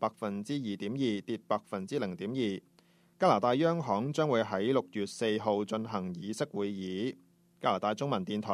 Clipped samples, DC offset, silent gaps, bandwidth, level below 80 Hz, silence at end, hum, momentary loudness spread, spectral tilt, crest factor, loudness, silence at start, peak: under 0.1%; under 0.1%; none; 13.5 kHz; -76 dBFS; 0 s; none; 9 LU; -6 dB/octave; 20 dB; -33 LUFS; 0 s; -12 dBFS